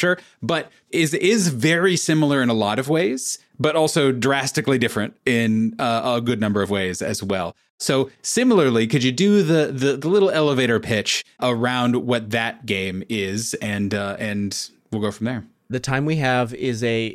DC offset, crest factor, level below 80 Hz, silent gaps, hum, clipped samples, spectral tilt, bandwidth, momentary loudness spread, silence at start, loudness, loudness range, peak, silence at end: under 0.1%; 14 dB; -58 dBFS; 7.70-7.78 s; none; under 0.1%; -4.5 dB/octave; 15.5 kHz; 8 LU; 0 s; -20 LUFS; 5 LU; -6 dBFS; 0 s